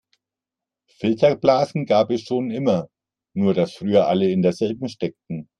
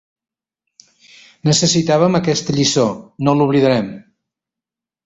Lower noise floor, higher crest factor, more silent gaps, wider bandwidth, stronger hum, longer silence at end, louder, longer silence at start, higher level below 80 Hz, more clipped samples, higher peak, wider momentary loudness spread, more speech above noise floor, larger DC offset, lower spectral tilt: about the same, -88 dBFS vs -87 dBFS; about the same, 18 dB vs 16 dB; neither; first, 10.5 kHz vs 8.2 kHz; neither; second, 0.15 s vs 1.05 s; second, -21 LUFS vs -15 LUFS; second, 1 s vs 1.45 s; second, -62 dBFS vs -52 dBFS; neither; about the same, -2 dBFS vs -2 dBFS; first, 11 LU vs 7 LU; second, 68 dB vs 72 dB; neither; first, -7.5 dB/octave vs -4.5 dB/octave